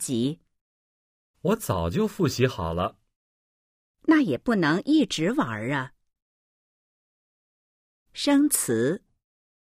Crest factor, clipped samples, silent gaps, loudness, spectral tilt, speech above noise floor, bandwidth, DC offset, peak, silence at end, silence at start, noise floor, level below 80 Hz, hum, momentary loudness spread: 18 dB; under 0.1%; 0.61-1.34 s, 3.16-3.94 s, 6.22-8.06 s; -25 LUFS; -5 dB/octave; over 66 dB; 15.5 kHz; under 0.1%; -8 dBFS; 0.7 s; 0 s; under -90 dBFS; -52 dBFS; none; 9 LU